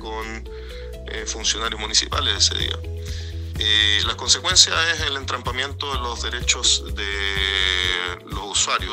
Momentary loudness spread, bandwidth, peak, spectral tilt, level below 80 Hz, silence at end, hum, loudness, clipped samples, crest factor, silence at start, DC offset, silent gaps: 16 LU; 16 kHz; 0 dBFS; -1 dB/octave; -34 dBFS; 0 s; none; -19 LUFS; under 0.1%; 22 dB; 0 s; under 0.1%; none